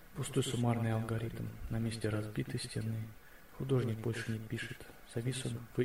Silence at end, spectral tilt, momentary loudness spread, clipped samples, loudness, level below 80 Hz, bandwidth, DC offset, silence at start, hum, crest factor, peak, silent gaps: 0 s; -6 dB/octave; 11 LU; under 0.1%; -38 LUFS; -56 dBFS; 16 kHz; 0.1%; 0 s; none; 16 dB; -20 dBFS; none